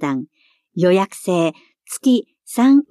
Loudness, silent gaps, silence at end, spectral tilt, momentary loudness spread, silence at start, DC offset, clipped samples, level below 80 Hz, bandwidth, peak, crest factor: -18 LUFS; none; 0.05 s; -6 dB/octave; 16 LU; 0 s; under 0.1%; under 0.1%; -72 dBFS; 14.5 kHz; -4 dBFS; 14 dB